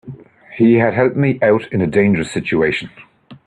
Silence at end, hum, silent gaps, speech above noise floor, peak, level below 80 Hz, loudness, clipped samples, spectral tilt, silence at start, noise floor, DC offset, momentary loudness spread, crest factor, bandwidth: 0.1 s; none; none; 21 dB; 0 dBFS; -50 dBFS; -15 LUFS; under 0.1%; -7.5 dB/octave; 0.05 s; -36 dBFS; under 0.1%; 8 LU; 16 dB; 10.5 kHz